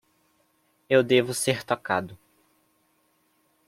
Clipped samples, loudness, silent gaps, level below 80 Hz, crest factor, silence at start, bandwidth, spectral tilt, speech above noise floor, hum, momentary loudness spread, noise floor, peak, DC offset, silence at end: under 0.1%; -24 LUFS; none; -68 dBFS; 22 dB; 0.9 s; 16 kHz; -4 dB/octave; 45 dB; none; 9 LU; -68 dBFS; -6 dBFS; under 0.1%; 1.55 s